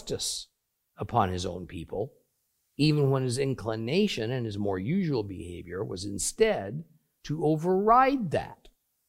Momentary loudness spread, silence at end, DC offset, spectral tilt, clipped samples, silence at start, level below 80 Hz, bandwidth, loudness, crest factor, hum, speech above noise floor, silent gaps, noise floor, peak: 15 LU; 0.4 s; under 0.1%; -5.5 dB/octave; under 0.1%; 0 s; -56 dBFS; 16 kHz; -28 LUFS; 20 dB; none; 48 dB; none; -76 dBFS; -8 dBFS